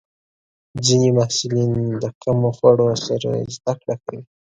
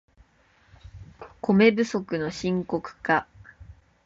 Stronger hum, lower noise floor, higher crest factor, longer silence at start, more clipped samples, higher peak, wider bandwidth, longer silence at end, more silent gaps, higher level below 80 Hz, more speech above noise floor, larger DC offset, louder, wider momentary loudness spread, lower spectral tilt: neither; first, under -90 dBFS vs -61 dBFS; about the same, 18 dB vs 20 dB; about the same, 0.75 s vs 0.85 s; neither; first, 0 dBFS vs -6 dBFS; first, 9.4 kHz vs 7.8 kHz; about the same, 0.35 s vs 0.35 s; first, 2.15-2.21 s vs none; about the same, -52 dBFS vs -54 dBFS; first, over 71 dB vs 38 dB; neither; first, -19 LUFS vs -24 LUFS; about the same, 13 LU vs 13 LU; about the same, -5.5 dB/octave vs -6.5 dB/octave